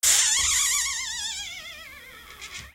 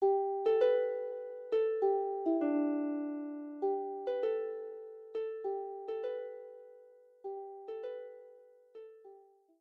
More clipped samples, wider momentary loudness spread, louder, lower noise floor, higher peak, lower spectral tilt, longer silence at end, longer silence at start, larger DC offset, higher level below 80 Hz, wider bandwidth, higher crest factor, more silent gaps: neither; first, 23 LU vs 18 LU; first, -22 LUFS vs -35 LUFS; second, -45 dBFS vs -61 dBFS; first, -4 dBFS vs -18 dBFS; second, 2.5 dB/octave vs -6.5 dB/octave; second, 0.05 s vs 0.4 s; about the same, 0.05 s vs 0 s; neither; first, -52 dBFS vs -88 dBFS; first, 16 kHz vs 5.2 kHz; about the same, 22 dB vs 18 dB; neither